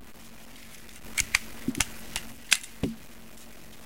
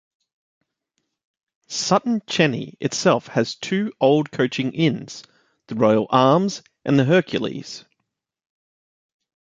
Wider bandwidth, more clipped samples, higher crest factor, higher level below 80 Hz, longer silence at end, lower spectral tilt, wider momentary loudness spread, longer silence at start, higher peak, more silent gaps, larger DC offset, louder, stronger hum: first, 17 kHz vs 9.4 kHz; neither; first, 34 dB vs 20 dB; first, -50 dBFS vs -64 dBFS; second, 0 s vs 1.75 s; second, -1.5 dB/octave vs -5.5 dB/octave; first, 22 LU vs 14 LU; second, 0 s vs 1.7 s; about the same, 0 dBFS vs -2 dBFS; neither; first, 0.6% vs under 0.1%; second, -29 LUFS vs -20 LUFS; neither